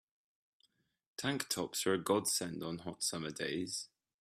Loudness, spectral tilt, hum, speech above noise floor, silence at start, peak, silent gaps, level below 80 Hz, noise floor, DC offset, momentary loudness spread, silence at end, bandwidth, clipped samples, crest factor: -37 LUFS; -3 dB/octave; none; 39 dB; 1.2 s; -18 dBFS; none; -76 dBFS; -77 dBFS; under 0.1%; 10 LU; 0.35 s; 16 kHz; under 0.1%; 22 dB